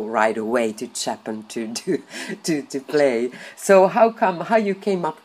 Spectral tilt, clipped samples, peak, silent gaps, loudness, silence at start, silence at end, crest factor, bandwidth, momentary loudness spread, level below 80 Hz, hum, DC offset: -4.5 dB/octave; under 0.1%; -2 dBFS; none; -21 LUFS; 0 s; 0.1 s; 20 dB; 15.5 kHz; 13 LU; -74 dBFS; none; under 0.1%